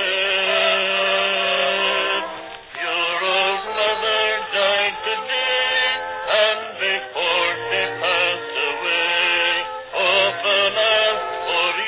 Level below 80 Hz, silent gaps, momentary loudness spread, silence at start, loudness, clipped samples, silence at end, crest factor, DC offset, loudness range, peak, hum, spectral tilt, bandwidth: -60 dBFS; none; 6 LU; 0 s; -18 LUFS; under 0.1%; 0 s; 16 dB; under 0.1%; 2 LU; -4 dBFS; none; -5.5 dB/octave; 4 kHz